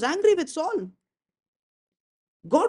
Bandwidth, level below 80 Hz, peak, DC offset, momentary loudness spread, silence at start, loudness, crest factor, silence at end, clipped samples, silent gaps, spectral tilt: 11 kHz; -72 dBFS; -8 dBFS; under 0.1%; 12 LU; 0 s; -25 LUFS; 20 dB; 0 s; under 0.1%; 1.48-1.92 s, 2.00-2.40 s; -4 dB/octave